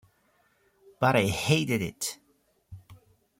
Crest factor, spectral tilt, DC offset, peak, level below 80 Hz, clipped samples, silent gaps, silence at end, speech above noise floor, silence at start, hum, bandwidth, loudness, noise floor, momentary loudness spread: 22 dB; -4.5 dB/octave; under 0.1%; -10 dBFS; -58 dBFS; under 0.1%; none; 0.45 s; 43 dB; 1 s; none; 16.5 kHz; -27 LUFS; -69 dBFS; 10 LU